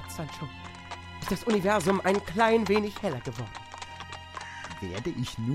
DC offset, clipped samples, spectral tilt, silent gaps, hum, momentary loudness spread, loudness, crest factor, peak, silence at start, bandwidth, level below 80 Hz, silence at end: under 0.1%; under 0.1%; -5.5 dB/octave; none; none; 17 LU; -29 LUFS; 20 dB; -10 dBFS; 0 s; 16 kHz; -52 dBFS; 0 s